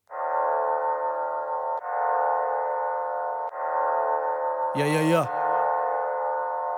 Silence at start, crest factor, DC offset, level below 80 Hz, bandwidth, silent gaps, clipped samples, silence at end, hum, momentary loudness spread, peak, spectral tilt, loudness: 0.1 s; 16 dB; under 0.1%; -84 dBFS; 17.5 kHz; none; under 0.1%; 0 s; none; 6 LU; -10 dBFS; -6 dB/octave; -26 LUFS